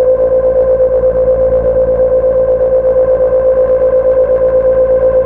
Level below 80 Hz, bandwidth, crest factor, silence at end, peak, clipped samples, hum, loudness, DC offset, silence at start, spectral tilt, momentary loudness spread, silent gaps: -28 dBFS; 2.7 kHz; 6 dB; 0 s; -2 dBFS; under 0.1%; none; -10 LUFS; under 0.1%; 0 s; -10.5 dB/octave; 1 LU; none